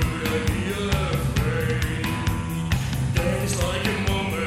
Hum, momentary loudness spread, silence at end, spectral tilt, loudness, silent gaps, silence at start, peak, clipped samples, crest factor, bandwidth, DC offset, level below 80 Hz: none; 2 LU; 0 s; -5.5 dB/octave; -24 LUFS; none; 0 s; -6 dBFS; under 0.1%; 18 dB; 16.5 kHz; under 0.1%; -32 dBFS